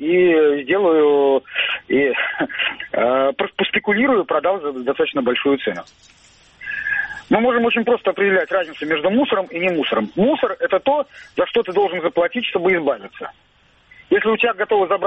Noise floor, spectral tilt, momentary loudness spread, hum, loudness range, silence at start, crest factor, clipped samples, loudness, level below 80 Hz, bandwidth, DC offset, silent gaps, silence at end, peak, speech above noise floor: -52 dBFS; -6.5 dB/octave; 7 LU; none; 3 LU; 0 s; 14 dB; under 0.1%; -18 LUFS; -56 dBFS; 8 kHz; under 0.1%; none; 0 s; -4 dBFS; 34 dB